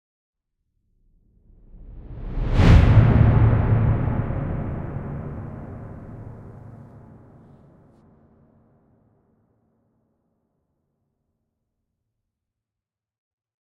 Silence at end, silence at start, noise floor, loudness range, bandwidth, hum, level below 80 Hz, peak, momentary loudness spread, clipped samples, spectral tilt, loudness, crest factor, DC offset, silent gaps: 6.85 s; 1.75 s; -89 dBFS; 20 LU; 6.8 kHz; none; -30 dBFS; -2 dBFS; 26 LU; under 0.1%; -9 dB/octave; -19 LUFS; 22 dB; under 0.1%; none